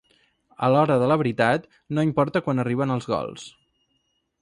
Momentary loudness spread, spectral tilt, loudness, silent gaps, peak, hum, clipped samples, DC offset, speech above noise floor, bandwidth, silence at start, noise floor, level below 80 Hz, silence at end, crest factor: 10 LU; -7.5 dB/octave; -23 LUFS; none; -6 dBFS; none; under 0.1%; under 0.1%; 50 dB; 11 kHz; 0.6 s; -72 dBFS; -60 dBFS; 0.9 s; 18 dB